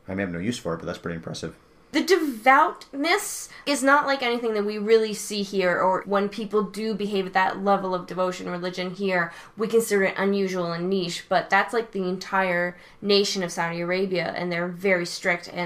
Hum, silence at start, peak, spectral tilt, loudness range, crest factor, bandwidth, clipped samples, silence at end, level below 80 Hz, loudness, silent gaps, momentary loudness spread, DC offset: none; 0.1 s; -6 dBFS; -4 dB/octave; 3 LU; 18 dB; 15.5 kHz; under 0.1%; 0 s; -60 dBFS; -24 LUFS; none; 10 LU; under 0.1%